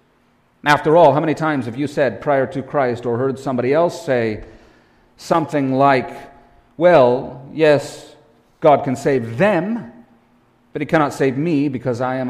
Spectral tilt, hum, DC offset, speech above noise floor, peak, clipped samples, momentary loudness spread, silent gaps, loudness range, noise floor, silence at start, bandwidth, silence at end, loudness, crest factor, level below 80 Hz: -6.5 dB/octave; none; under 0.1%; 41 dB; -2 dBFS; under 0.1%; 13 LU; none; 3 LU; -58 dBFS; 0.65 s; 14.5 kHz; 0 s; -17 LUFS; 16 dB; -54 dBFS